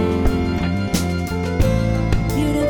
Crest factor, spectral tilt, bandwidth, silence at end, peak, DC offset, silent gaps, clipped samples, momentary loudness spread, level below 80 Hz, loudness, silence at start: 16 dB; -6.5 dB/octave; 20 kHz; 0 s; -2 dBFS; under 0.1%; none; under 0.1%; 3 LU; -24 dBFS; -20 LUFS; 0 s